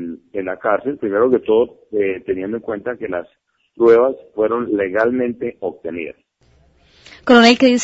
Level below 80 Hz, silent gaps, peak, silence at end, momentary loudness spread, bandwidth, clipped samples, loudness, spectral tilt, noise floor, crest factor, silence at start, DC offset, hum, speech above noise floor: -56 dBFS; none; 0 dBFS; 0 s; 16 LU; 8 kHz; under 0.1%; -17 LUFS; -4.5 dB/octave; -55 dBFS; 16 dB; 0 s; under 0.1%; none; 39 dB